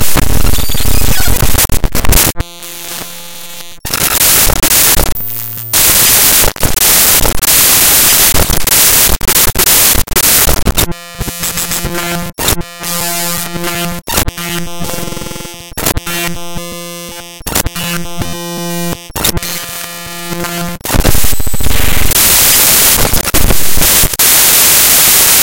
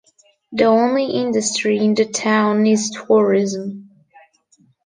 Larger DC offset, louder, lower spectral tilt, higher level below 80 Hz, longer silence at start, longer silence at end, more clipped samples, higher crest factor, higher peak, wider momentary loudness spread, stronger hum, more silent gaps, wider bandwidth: neither; first, -8 LUFS vs -17 LUFS; second, -1.5 dB/octave vs -4.5 dB/octave; first, -20 dBFS vs -64 dBFS; second, 0 s vs 0.5 s; second, 0 s vs 1.05 s; first, 1% vs under 0.1%; second, 10 dB vs 16 dB; about the same, 0 dBFS vs -2 dBFS; first, 17 LU vs 11 LU; neither; neither; first, over 20 kHz vs 9.8 kHz